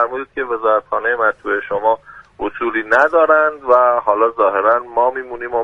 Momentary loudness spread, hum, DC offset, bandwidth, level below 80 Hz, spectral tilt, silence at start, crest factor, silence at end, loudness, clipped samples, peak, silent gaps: 10 LU; none; under 0.1%; 7.2 kHz; -52 dBFS; -5.5 dB/octave; 0 s; 16 dB; 0 s; -16 LUFS; under 0.1%; 0 dBFS; none